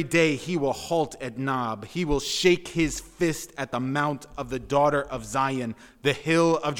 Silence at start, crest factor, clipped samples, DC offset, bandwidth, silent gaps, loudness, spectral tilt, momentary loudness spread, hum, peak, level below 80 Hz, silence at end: 0 s; 18 dB; under 0.1%; under 0.1%; 18 kHz; none; -26 LUFS; -4.5 dB/octave; 9 LU; none; -8 dBFS; -46 dBFS; 0 s